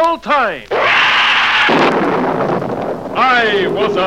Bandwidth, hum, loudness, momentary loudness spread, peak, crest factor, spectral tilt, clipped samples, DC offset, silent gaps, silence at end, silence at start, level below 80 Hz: 15.5 kHz; none; -12 LUFS; 8 LU; -2 dBFS; 12 dB; -4.5 dB/octave; under 0.1%; 0.5%; none; 0 s; 0 s; -48 dBFS